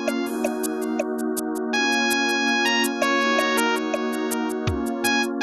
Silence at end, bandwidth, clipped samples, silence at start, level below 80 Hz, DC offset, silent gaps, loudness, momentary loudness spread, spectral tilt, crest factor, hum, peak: 0 s; 13 kHz; under 0.1%; 0 s; -48 dBFS; under 0.1%; none; -22 LUFS; 6 LU; -3 dB/octave; 16 dB; none; -6 dBFS